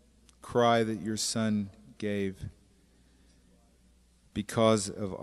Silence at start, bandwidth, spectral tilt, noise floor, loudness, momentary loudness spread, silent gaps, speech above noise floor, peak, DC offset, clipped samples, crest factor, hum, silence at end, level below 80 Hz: 0.45 s; 13.5 kHz; -4.5 dB/octave; -63 dBFS; -30 LUFS; 16 LU; none; 34 dB; -10 dBFS; under 0.1%; under 0.1%; 22 dB; none; 0 s; -60 dBFS